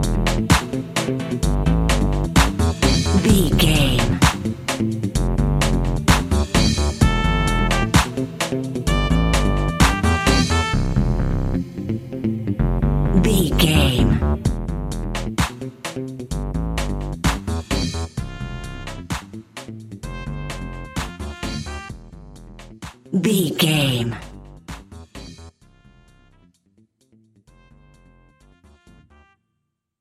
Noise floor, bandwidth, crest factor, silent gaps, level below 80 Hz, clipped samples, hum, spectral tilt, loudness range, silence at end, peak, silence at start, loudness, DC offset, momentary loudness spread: -76 dBFS; 16 kHz; 20 dB; none; -26 dBFS; under 0.1%; none; -5 dB/octave; 13 LU; 4.5 s; 0 dBFS; 0 s; -20 LUFS; under 0.1%; 17 LU